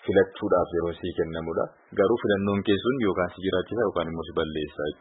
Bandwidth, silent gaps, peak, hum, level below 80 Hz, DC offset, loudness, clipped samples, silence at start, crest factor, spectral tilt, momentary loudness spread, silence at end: 4.1 kHz; none; -8 dBFS; none; -52 dBFS; under 0.1%; -26 LUFS; under 0.1%; 0 s; 18 dB; -10.5 dB/octave; 7 LU; 0.05 s